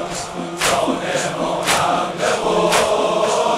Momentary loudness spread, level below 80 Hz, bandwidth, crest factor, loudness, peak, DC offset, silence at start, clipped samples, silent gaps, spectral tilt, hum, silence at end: 5 LU; -48 dBFS; 16 kHz; 16 dB; -18 LUFS; -2 dBFS; under 0.1%; 0 s; under 0.1%; none; -3 dB/octave; none; 0 s